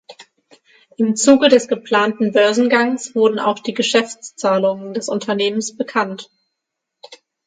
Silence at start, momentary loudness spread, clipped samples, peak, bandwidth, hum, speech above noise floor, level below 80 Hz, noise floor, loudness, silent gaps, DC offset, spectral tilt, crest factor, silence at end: 0.1 s; 10 LU; under 0.1%; 0 dBFS; 9.6 kHz; none; 62 dB; -68 dBFS; -79 dBFS; -17 LUFS; none; under 0.1%; -3.5 dB/octave; 18 dB; 0.3 s